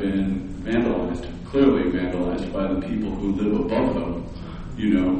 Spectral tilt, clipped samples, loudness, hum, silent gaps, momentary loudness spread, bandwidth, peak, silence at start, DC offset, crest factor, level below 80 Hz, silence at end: -8 dB/octave; under 0.1%; -24 LUFS; none; none; 11 LU; 8.6 kHz; -4 dBFS; 0 s; under 0.1%; 18 dB; -36 dBFS; 0 s